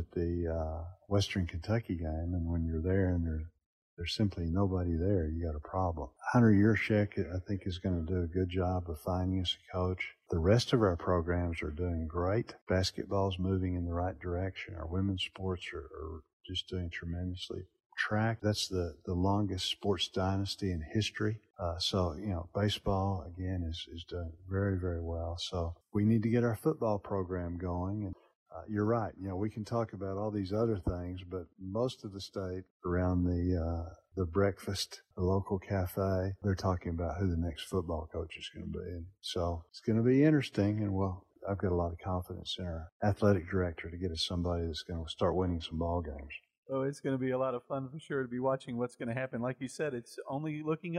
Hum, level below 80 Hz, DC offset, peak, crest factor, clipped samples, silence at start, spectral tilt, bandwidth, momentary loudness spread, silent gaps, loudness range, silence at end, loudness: none; -48 dBFS; under 0.1%; -14 dBFS; 20 dB; under 0.1%; 0 s; -6.5 dB/octave; 13.5 kHz; 11 LU; 3.66-3.97 s, 12.62-12.67 s, 16.33-16.44 s, 17.86-17.90 s, 28.35-28.46 s, 32.70-32.80 s, 42.92-43.00 s, 46.58-46.63 s; 5 LU; 0 s; -34 LUFS